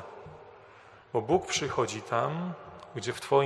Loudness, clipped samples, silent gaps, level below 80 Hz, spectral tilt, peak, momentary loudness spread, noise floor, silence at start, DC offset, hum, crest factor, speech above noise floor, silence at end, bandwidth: -31 LUFS; under 0.1%; none; -64 dBFS; -4.5 dB/octave; -10 dBFS; 21 LU; -54 dBFS; 0 s; under 0.1%; none; 20 dB; 25 dB; 0 s; 13 kHz